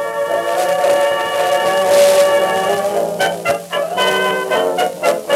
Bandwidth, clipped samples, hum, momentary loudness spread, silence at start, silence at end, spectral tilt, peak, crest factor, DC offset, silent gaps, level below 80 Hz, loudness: 16.5 kHz; under 0.1%; none; 7 LU; 0 s; 0 s; -2.5 dB/octave; 0 dBFS; 14 dB; under 0.1%; none; -64 dBFS; -15 LUFS